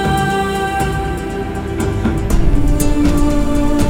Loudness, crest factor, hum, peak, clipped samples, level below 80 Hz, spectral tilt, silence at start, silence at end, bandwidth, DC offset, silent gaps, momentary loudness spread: -17 LUFS; 14 dB; none; 0 dBFS; under 0.1%; -18 dBFS; -6 dB/octave; 0 s; 0 s; 16.5 kHz; under 0.1%; none; 7 LU